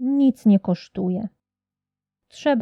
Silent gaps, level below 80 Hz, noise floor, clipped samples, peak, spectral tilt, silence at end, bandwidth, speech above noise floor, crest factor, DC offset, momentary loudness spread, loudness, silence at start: none; -64 dBFS; -89 dBFS; under 0.1%; -8 dBFS; -8 dB/octave; 0 s; 7.8 kHz; 69 dB; 14 dB; under 0.1%; 10 LU; -21 LUFS; 0 s